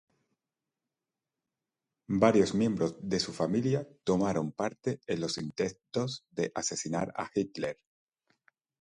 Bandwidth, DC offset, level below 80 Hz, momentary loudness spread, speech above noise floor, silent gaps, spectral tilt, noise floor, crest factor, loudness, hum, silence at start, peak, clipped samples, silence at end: 11.5 kHz; under 0.1%; -64 dBFS; 9 LU; 59 dB; none; -5 dB/octave; -90 dBFS; 24 dB; -31 LUFS; none; 2.1 s; -8 dBFS; under 0.1%; 1.05 s